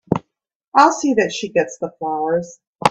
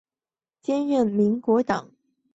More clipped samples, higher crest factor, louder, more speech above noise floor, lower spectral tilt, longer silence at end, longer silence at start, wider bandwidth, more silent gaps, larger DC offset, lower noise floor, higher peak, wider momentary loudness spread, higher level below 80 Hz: neither; about the same, 18 dB vs 16 dB; first, -18 LUFS vs -23 LUFS; second, 59 dB vs over 68 dB; second, -4.5 dB/octave vs -7.5 dB/octave; second, 0 s vs 0.55 s; second, 0.1 s vs 0.7 s; first, 12 kHz vs 8 kHz; first, 0.55-0.60 s, 0.68-0.72 s, 2.67-2.73 s vs none; neither; second, -77 dBFS vs under -90 dBFS; first, 0 dBFS vs -8 dBFS; first, 11 LU vs 8 LU; first, -56 dBFS vs -64 dBFS